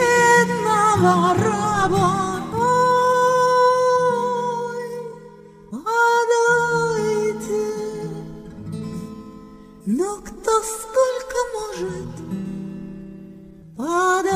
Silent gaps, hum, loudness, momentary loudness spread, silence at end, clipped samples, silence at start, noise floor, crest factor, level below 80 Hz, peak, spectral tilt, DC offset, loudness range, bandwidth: none; none; -19 LUFS; 18 LU; 0 s; under 0.1%; 0 s; -43 dBFS; 16 dB; -50 dBFS; -4 dBFS; -4.5 dB/octave; under 0.1%; 9 LU; 15.5 kHz